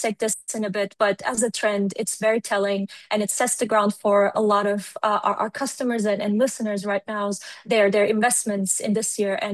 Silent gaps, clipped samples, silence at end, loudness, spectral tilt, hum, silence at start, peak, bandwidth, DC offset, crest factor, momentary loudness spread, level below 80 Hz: none; under 0.1%; 0 s; -22 LUFS; -3.5 dB/octave; none; 0 s; -6 dBFS; 12.5 kHz; under 0.1%; 16 dB; 7 LU; -70 dBFS